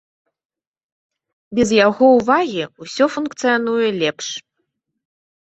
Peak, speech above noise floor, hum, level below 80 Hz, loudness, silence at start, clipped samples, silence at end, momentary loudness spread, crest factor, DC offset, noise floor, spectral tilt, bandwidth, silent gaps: -2 dBFS; 57 dB; none; -56 dBFS; -17 LUFS; 1.5 s; under 0.1%; 1.2 s; 15 LU; 18 dB; under 0.1%; -74 dBFS; -4 dB/octave; 8.2 kHz; none